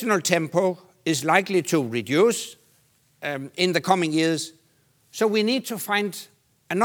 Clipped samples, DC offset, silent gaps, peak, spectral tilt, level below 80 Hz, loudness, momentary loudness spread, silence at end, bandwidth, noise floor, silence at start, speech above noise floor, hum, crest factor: under 0.1%; under 0.1%; none; 0 dBFS; -4 dB/octave; -76 dBFS; -23 LUFS; 11 LU; 0 s; over 20 kHz; -63 dBFS; 0 s; 40 dB; none; 22 dB